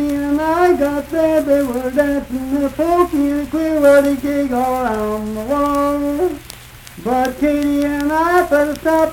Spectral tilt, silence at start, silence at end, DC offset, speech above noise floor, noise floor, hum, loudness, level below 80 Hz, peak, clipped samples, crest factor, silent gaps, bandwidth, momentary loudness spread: -5.5 dB/octave; 0 s; 0 s; under 0.1%; 21 dB; -36 dBFS; none; -16 LUFS; -38 dBFS; -2 dBFS; under 0.1%; 14 dB; none; 18 kHz; 8 LU